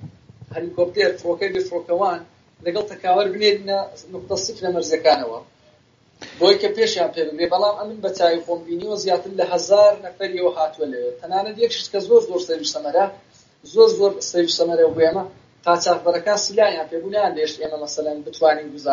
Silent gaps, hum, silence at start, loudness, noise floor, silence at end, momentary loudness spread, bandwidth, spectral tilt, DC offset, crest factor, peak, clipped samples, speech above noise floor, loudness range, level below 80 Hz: none; none; 0 s; -20 LUFS; -56 dBFS; 0 s; 11 LU; 7.4 kHz; -2 dB/octave; under 0.1%; 18 dB; -2 dBFS; under 0.1%; 36 dB; 3 LU; -64 dBFS